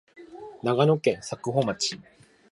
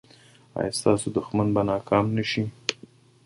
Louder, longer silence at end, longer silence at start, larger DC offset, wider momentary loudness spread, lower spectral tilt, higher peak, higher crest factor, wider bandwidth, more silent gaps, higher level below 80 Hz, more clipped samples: about the same, -26 LUFS vs -25 LUFS; about the same, 0.5 s vs 0.5 s; second, 0.2 s vs 0.55 s; neither; first, 21 LU vs 8 LU; about the same, -5 dB/octave vs -5.5 dB/octave; second, -8 dBFS vs -2 dBFS; about the same, 20 dB vs 24 dB; about the same, 11.5 kHz vs 12 kHz; neither; second, -66 dBFS vs -54 dBFS; neither